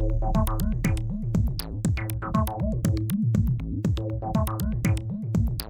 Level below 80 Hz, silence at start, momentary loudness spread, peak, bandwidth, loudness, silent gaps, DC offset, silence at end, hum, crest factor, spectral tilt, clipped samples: -30 dBFS; 0 s; 4 LU; -10 dBFS; over 20 kHz; -27 LUFS; none; under 0.1%; 0 s; none; 14 dB; -7 dB/octave; under 0.1%